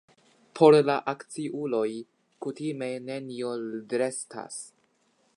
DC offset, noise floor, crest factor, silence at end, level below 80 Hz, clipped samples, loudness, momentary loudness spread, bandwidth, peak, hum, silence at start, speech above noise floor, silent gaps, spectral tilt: under 0.1%; -69 dBFS; 22 dB; 0.7 s; -82 dBFS; under 0.1%; -27 LUFS; 20 LU; 11 kHz; -6 dBFS; none; 0.55 s; 42 dB; none; -5.5 dB/octave